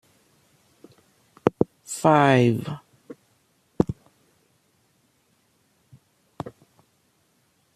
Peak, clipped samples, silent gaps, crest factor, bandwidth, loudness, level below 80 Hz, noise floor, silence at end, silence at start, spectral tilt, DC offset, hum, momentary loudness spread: -4 dBFS; under 0.1%; none; 24 dB; 14.5 kHz; -22 LUFS; -58 dBFS; -66 dBFS; 1.25 s; 1.45 s; -6.5 dB/octave; under 0.1%; none; 30 LU